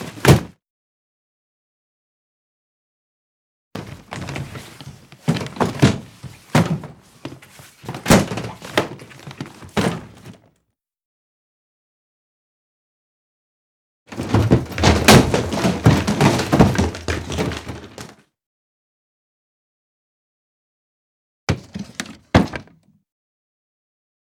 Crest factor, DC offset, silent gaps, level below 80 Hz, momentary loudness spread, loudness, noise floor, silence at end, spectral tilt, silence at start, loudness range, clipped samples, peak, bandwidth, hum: 22 dB; under 0.1%; 0.70-3.71 s, 11.05-14.06 s, 18.46-21.47 s; -38 dBFS; 23 LU; -18 LUFS; -72 dBFS; 1.7 s; -5.5 dB/octave; 0 s; 18 LU; under 0.1%; 0 dBFS; over 20 kHz; none